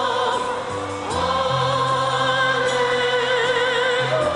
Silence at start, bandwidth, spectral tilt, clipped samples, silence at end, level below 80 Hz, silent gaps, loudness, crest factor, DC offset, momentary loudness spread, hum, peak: 0 s; 11.5 kHz; -3.5 dB/octave; under 0.1%; 0 s; -52 dBFS; none; -20 LUFS; 12 dB; under 0.1%; 7 LU; none; -8 dBFS